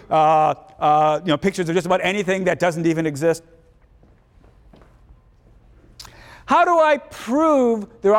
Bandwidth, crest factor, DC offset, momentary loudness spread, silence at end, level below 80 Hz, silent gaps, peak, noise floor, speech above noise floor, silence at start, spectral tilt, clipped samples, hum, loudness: 16 kHz; 14 dB; under 0.1%; 7 LU; 0 s; -52 dBFS; none; -6 dBFS; -53 dBFS; 35 dB; 0.1 s; -5.5 dB/octave; under 0.1%; none; -19 LUFS